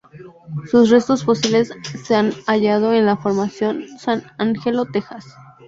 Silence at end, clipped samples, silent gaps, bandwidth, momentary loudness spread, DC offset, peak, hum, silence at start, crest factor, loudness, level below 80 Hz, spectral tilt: 0.25 s; under 0.1%; none; 7.8 kHz; 12 LU; under 0.1%; -2 dBFS; none; 0.15 s; 16 dB; -18 LUFS; -58 dBFS; -5.5 dB/octave